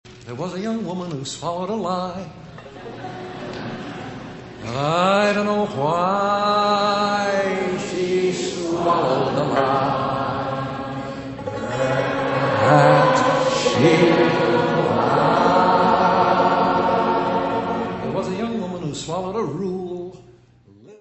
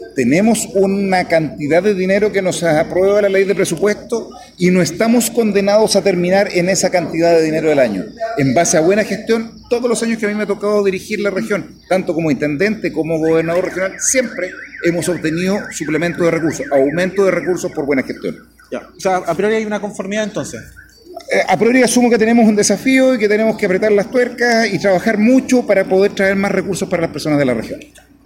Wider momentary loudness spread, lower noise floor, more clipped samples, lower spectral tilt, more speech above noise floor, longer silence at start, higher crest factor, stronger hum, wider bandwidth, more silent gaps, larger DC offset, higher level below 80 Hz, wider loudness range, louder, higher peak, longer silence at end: first, 16 LU vs 9 LU; first, -50 dBFS vs -35 dBFS; neither; about the same, -5.5 dB/octave vs -4.5 dB/octave; first, 31 dB vs 20 dB; about the same, 0.05 s vs 0 s; about the same, 18 dB vs 14 dB; neither; second, 8.4 kHz vs 16.5 kHz; neither; neither; about the same, -52 dBFS vs -50 dBFS; first, 11 LU vs 5 LU; second, -20 LUFS vs -15 LUFS; about the same, -2 dBFS vs 0 dBFS; second, 0.05 s vs 0.4 s